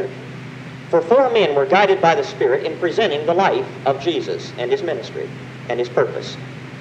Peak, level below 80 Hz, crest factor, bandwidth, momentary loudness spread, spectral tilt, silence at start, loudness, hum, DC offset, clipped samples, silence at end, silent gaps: 0 dBFS; -62 dBFS; 18 dB; 8.8 kHz; 18 LU; -5.5 dB/octave; 0 s; -18 LUFS; none; under 0.1%; under 0.1%; 0 s; none